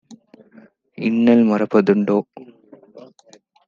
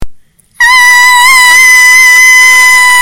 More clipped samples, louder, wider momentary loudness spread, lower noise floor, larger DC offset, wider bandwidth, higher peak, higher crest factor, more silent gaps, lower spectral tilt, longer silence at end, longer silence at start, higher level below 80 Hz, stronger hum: second, under 0.1% vs 10%; second, -17 LUFS vs 0 LUFS; first, 10 LU vs 2 LU; first, -52 dBFS vs -31 dBFS; neither; second, 7.2 kHz vs over 20 kHz; about the same, -2 dBFS vs 0 dBFS; first, 18 dB vs 4 dB; neither; first, -8.5 dB/octave vs 2.5 dB/octave; first, 0.65 s vs 0 s; about the same, 0.1 s vs 0 s; second, -68 dBFS vs -36 dBFS; neither